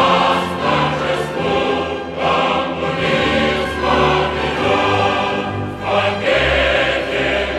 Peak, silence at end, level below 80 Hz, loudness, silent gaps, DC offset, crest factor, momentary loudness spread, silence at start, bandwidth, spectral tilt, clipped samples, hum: 0 dBFS; 0 s; -34 dBFS; -16 LUFS; none; under 0.1%; 16 dB; 5 LU; 0 s; 13.5 kHz; -5 dB/octave; under 0.1%; none